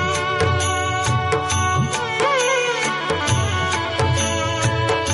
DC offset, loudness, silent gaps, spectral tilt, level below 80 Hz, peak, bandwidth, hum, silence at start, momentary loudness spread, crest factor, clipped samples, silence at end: under 0.1%; -19 LUFS; none; -3.5 dB/octave; -40 dBFS; -2 dBFS; 11.5 kHz; none; 0 s; 3 LU; 18 dB; under 0.1%; 0 s